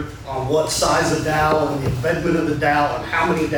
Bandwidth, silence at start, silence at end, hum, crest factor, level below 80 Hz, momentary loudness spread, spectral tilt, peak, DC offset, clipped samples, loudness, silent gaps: over 20 kHz; 0 s; 0 s; none; 14 dB; -38 dBFS; 4 LU; -4.5 dB/octave; -6 dBFS; under 0.1%; under 0.1%; -19 LUFS; none